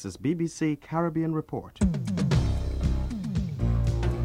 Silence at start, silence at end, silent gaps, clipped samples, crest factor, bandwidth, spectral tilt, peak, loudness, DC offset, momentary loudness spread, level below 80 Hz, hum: 0 s; 0 s; none; under 0.1%; 14 dB; 11.5 kHz; -7.5 dB/octave; -12 dBFS; -28 LUFS; under 0.1%; 5 LU; -32 dBFS; none